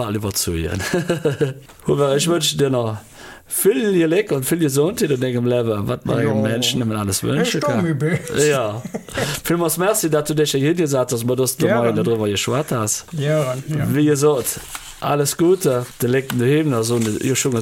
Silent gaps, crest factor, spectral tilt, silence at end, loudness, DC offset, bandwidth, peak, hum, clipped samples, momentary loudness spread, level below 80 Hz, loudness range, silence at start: none; 14 dB; -5 dB/octave; 0 s; -19 LUFS; under 0.1%; 17 kHz; -4 dBFS; none; under 0.1%; 6 LU; -48 dBFS; 1 LU; 0 s